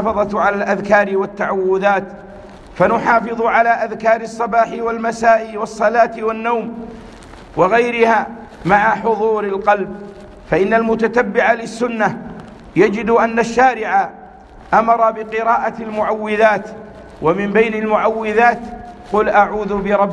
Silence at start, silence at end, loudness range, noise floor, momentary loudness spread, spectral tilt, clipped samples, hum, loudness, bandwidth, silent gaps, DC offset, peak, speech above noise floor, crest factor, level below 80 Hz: 0 s; 0 s; 1 LU; -38 dBFS; 13 LU; -6 dB/octave; under 0.1%; none; -16 LUFS; 10 kHz; none; under 0.1%; 0 dBFS; 23 dB; 16 dB; -46 dBFS